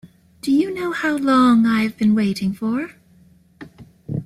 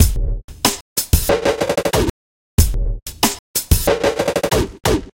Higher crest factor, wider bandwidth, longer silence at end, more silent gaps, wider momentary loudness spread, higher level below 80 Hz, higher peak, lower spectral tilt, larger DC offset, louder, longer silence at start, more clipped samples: about the same, 14 dB vs 18 dB; second, 13.5 kHz vs 17 kHz; about the same, 0 s vs 0.05 s; second, none vs 0.44-0.48 s, 0.81-0.96 s, 2.10-2.57 s, 3.39-3.54 s; first, 13 LU vs 6 LU; second, -56 dBFS vs -22 dBFS; second, -6 dBFS vs 0 dBFS; first, -6.5 dB/octave vs -4 dB/octave; neither; about the same, -19 LUFS vs -18 LUFS; about the same, 0.05 s vs 0 s; neither